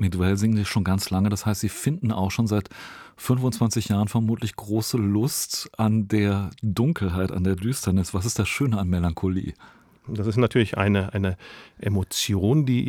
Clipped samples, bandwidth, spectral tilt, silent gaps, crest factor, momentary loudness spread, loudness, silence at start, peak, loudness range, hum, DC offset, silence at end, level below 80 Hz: under 0.1%; 18 kHz; -5.5 dB/octave; none; 18 dB; 7 LU; -24 LUFS; 0 s; -6 dBFS; 1 LU; none; under 0.1%; 0 s; -50 dBFS